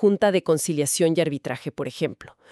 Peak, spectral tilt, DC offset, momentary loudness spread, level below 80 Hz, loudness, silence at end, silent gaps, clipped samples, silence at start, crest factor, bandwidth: -8 dBFS; -4.5 dB/octave; under 0.1%; 10 LU; -64 dBFS; -23 LUFS; 0.25 s; none; under 0.1%; 0 s; 16 dB; 13.5 kHz